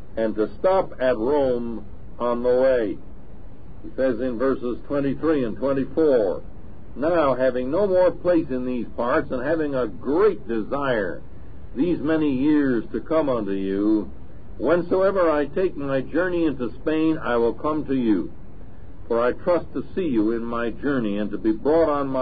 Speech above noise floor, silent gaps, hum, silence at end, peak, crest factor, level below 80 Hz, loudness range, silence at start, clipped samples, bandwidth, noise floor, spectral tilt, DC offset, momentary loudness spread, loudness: 20 dB; none; none; 0 s; -8 dBFS; 14 dB; -44 dBFS; 3 LU; 0 s; under 0.1%; 4.9 kHz; -42 dBFS; -11.5 dB/octave; 3%; 8 LU; -23 LUFS